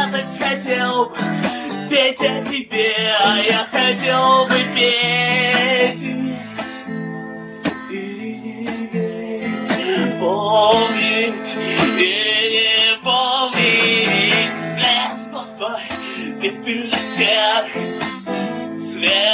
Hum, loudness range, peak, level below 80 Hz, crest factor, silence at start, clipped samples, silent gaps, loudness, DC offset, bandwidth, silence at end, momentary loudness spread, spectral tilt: none; 9 LU; -2 dBFS; -58 dBFS; 16 dB; 0 s; under 0.1%; none; -17 LUFS; under 0.1%; 4 kHz; 0 s; 14 LU; -8 dB/octave